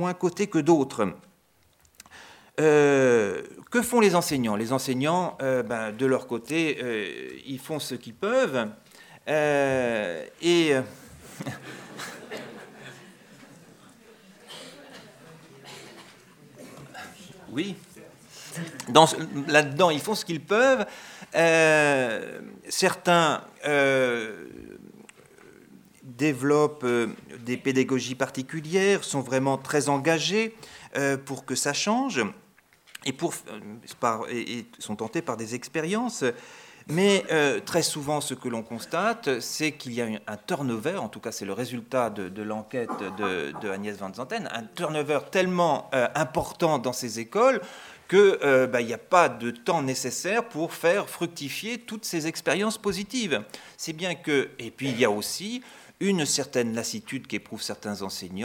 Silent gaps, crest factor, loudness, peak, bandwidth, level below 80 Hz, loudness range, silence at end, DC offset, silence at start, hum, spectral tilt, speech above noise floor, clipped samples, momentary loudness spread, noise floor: none; 26 dB; -26 LUFS; 0 dBFS; 17.5 kHz; -66 dBFS; 9 LU; 0 s; under 0.1%; 0 s; none; -4 dB/octave; 38 dB; under 0.1%; 18 LU; -63 dBFS